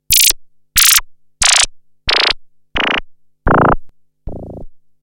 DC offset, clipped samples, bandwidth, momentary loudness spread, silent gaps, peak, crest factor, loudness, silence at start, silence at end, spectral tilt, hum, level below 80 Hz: under 0.1%; under 0.1%; 17 kHz; 22 LU; none; 0 dBFS; 16 dB; -12 LUFS; 0.1 s; 0.25 s; -1 dB/octave; none; -30 dBFS